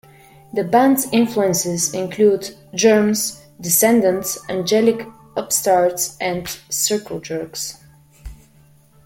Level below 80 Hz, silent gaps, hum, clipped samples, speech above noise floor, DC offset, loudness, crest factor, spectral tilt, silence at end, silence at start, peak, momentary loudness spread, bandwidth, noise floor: -50 dBFS; none; none; under 0.1%; 33 dB; under 0.1%; -18 LUFS; 16 dB; -3.5 dB/octave; 0.7 s; 0.55 s; -2 dBFS; 13 LU; 16.5 kHz; -51 dBFS